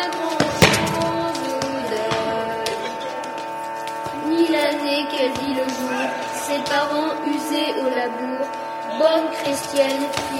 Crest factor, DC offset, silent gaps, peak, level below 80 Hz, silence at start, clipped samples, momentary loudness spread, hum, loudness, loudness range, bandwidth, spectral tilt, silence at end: 22 dB; under 0.1%; none; 0 dBFS; -54 dBFS; 0 s; under 0.1%; 9 LU; none; -22 LUFS; 3 LU; 16.5 kHz; -4 dB/octave; 0 s